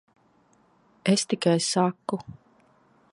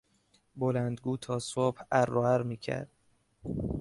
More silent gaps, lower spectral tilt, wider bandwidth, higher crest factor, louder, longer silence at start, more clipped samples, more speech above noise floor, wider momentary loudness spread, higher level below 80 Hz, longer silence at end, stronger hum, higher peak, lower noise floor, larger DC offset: neither; second, -4.5 dB/octave vs -6.5 dB/octave; about the same, 11.5 kHz vs 11.5 kHz; about the same, 22 dB vs 20 dB; first, -25 LUFS vs -31 LUFS; first, 1.05 s vs 0.55 s; neither; about the same, 38 dB vs 39 dB; about the same, 12 LU vs 11 LU; second, -68 dBFS vs -54 dBFS; first, 0.8 s vs 0 s; neither; first, -6 dBFS vs -12 dBFS; second, -63 dBFS vs -69 dBFS; neither